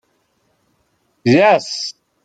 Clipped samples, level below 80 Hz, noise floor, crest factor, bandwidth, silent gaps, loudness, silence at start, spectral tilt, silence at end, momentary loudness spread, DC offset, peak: under 0.1%; -60 dBFS; -64 dBFS; 16 dB; 9.2 kHz; none; -15 LUFS; 1.25 s; -5 dB/octave; 0.35 s; 13 LU; under 0.1%; -2 dBFS